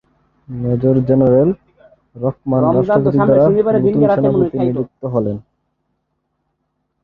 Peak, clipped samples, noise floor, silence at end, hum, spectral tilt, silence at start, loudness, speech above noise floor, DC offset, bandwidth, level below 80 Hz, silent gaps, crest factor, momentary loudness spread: -2 dBFS; under 0.1%; -70 dBFS; 1.65 s; none; -12 dB/octave; 0.5 s; -15 LUFS; 56 dB; under 0.1%; 4.7 kHz; -46 dBFS; none; 14 dB; 11 LU